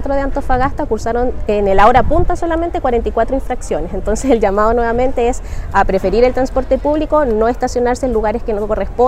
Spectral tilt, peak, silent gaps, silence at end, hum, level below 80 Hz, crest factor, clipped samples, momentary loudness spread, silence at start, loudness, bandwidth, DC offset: -6 dB/octave; 0 dBFS; none; 0 s; none; -24 dBFS; 14 dB; under 0.1%; 7 LU; 0 s; -15 LUFS; 11.5 kHz; under 0.1%